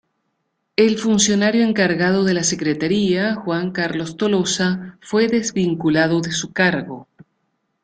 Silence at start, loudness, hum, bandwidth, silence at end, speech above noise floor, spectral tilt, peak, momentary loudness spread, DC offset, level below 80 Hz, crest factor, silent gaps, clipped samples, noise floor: 0.8 s; -18 LUFS; none; 9.6 kHz; 0.8 s; 54 dB; -4.5 dB/octave; -2 dBFS; 7 LU; under 0.1%; -56 dBFS; 16 dB; none; under 0.1%; -72 dBFS